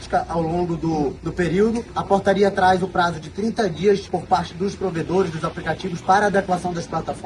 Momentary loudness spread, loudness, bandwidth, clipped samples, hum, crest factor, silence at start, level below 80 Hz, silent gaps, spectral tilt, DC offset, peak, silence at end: 9 LU; -21 LUFS; 11.5 kHz; under 0.1%; none; 18 dB; 0 s; -44 dBFS; none; -6 dB/octave; under 0.1%; -2 dBFS; 0 s